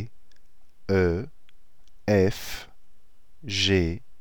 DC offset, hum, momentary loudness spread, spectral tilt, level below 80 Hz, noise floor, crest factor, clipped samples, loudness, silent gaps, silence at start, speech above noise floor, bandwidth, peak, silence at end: 1%; none; 20 LU; -5.5 dB/octave; -46 dBFS; -58 dBFS; 18 dB; under 0.1%; -25 LUFS; none; 0 s; 34 dB; 19.5 kHz; -8 dBFS; 0.2 s